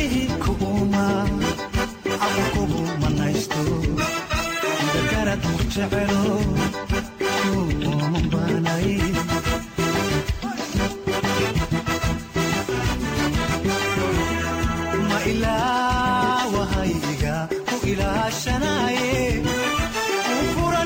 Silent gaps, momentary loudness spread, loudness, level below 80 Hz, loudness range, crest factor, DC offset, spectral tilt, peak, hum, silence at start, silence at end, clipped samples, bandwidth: none; 4 LU; -22 LUFS; -34 dBFS; 1 LU; 12 dB; under 0.1%; -5 dB/octave; -10 dBFS; none; 0 s; 0 s; under 0.1%; 16.5 kHz